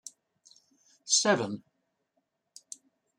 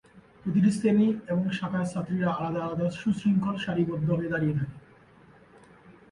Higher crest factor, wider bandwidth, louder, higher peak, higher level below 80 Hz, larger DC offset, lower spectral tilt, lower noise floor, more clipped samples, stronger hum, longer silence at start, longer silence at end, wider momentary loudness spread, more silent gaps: first, 24 dB vs 16 dB; first, 14 kHz vs 11 kHz; about the same, -26 LUFS vs -27 LUFS; about the same, -12 dBFS vs -12 dBFS; second, -82 dBFS vs -60 dBFS; neither; second, -2 dB/octave vs -7.5 dB/octave; first, -79 dBFS vs -55 dBFS; neither; neither; first, 1.05 s vs 0.15 s; first, 1.6 s vs 0.2 s; first, 24 LU vs 7 LU; neither